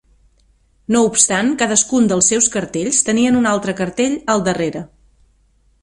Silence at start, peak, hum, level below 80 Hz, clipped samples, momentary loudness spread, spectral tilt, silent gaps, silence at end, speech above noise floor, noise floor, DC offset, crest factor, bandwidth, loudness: 0.9 s; 0 dBFS; none; -50 dBFS; under 0.1%; 9 LU; -3 dB/octave; none; 0.95 s; 41 dB; -57 dBFS; under 0.1%; 18 dB; 11.5 kHz; -15 LUFS